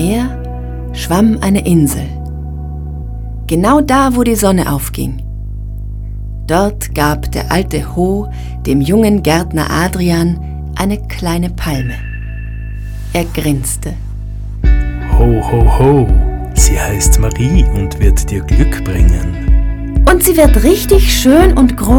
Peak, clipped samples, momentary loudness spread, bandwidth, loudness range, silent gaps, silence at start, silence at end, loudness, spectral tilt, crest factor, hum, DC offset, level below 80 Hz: 0 dBFS; 0.2%; 16 LU; 18.5 kHz; 7 LU; none; 0 s; 0 s; -12 LUFS; -5.5 dB/octave; 12 dB; none; under 0.1%; -16 dBFS